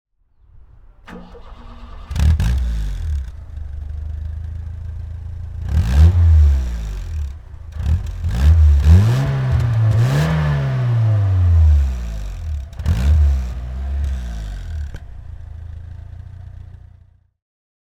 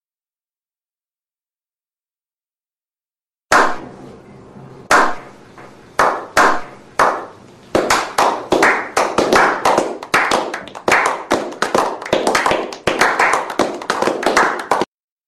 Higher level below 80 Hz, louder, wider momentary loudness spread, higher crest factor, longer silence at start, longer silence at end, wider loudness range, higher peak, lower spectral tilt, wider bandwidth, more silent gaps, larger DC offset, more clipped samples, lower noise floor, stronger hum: first, -20 dBFS vs -48 dBFS; about the same, -18 LUFS vs -16 LUFS; first, 23 LU vs 9 LU; about the same, 18 dB vs 18 dB; second, 1.1 s vs 3.5 s; first, 1.15 s vs 0.4 s; first, 13 LU vs 7 LU; about the same, 0 dBFS vs 0 dBFS; first, -7.5 dB/octave vs -2.5 dB/octave; second, 8.4 kHz vs 13 kHz; neither; neither; neither; second, -51 dBFS vs under -90 dBFS; neither